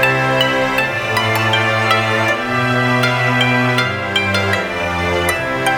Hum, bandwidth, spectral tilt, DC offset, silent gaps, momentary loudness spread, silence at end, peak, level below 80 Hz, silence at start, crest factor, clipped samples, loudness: none; 19 kHz; -4.5 dB/octave; under 0.1%; none; 3 LU; 0 s; 0 dBFS; -44 dBFS; 0 s; 16 dB; under 0.1%; -15 LUFS